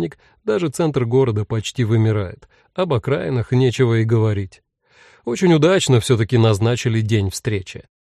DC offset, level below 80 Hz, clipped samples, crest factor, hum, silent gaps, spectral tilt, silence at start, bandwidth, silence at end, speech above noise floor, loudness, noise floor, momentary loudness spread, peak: under 0.1%; -50 dBFS; under 0.1%; 14 dB; none; none; -6.5 dB/octave; 0 s; 13 kHz; 0.25 s; 35 dB; -18 LUFS; -52 dBFS; 12 LU; -4 dBFS